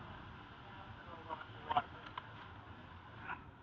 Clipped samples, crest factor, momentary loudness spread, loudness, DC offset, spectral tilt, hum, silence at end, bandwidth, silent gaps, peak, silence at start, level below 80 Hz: under 0.1%; 28 dB; 15 LU; -47 LUFS; under 0.1%; -3 dB/octave; none; 0 s; 7.2 kHz; none; -20 dBFS; 0 s; -66 dBFS